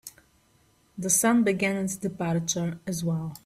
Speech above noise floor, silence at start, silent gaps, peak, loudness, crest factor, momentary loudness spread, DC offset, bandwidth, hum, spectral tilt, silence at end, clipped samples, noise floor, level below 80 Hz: 37 dB; 0.05 s; none; -8 dBFS; -26 LUFS; 20 dB; 12 LU; under 0.1%; 16 kHz; none; -4.5 dB/octave; 0.05 s; under 0.1%; -64 dBFS; -62 dBFS